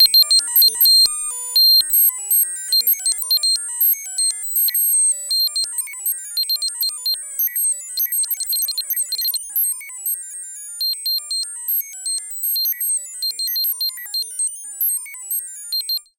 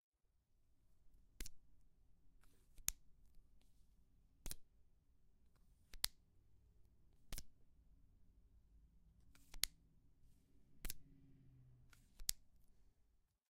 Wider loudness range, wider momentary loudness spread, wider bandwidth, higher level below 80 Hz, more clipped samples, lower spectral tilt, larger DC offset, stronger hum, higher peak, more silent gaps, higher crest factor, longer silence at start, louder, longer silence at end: first, 8 LU vs 2 LU; second, 12 LU vs 24 LU; first, 17.5 kHz vs 15.5 kHz; second, -68 dBFS vs -62 dBFS; neither; second, 6 dB/octave vs 0 dB/octave; neither; neither; first, -2 dBFS vs -12 dBFS; neither; second, 18 dB vs 44 dB; second, 0 s vs 0.75 s; first, -16 LUFS vs -49 LUFS; second, 0.2 s vs 0.35 s